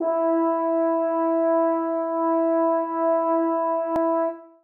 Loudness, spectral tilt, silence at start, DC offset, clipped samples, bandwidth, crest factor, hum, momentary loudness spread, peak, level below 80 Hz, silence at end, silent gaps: -22 LUFS; -8.5 dB/octave; 0 s; under 0.1%; under 0.1%; 3.1 kHz; 10 dB; none; 3 LU; -12 dBFS; -68 dBFS; 0.2 s; none